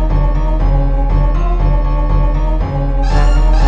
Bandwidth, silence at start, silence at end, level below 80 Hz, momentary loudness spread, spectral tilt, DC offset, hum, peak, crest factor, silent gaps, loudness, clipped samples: 6 kHz; 0 s; 0 s; -12 dBFS; 4 LU; -8 dB/octave; 0.7%; none; 0 dBFS; 10 dB; none; -16 LUFS; under 0.1%